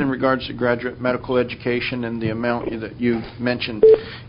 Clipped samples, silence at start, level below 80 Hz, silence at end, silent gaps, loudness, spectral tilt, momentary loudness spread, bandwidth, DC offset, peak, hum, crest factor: under 0.1%; 0 s; -46 dBFS; 0 s; none; -21 LUFS; -11 dB/octave; 10 LU; 5.4 kHz; under 0.1%; -4 dBFS; none; 18 dB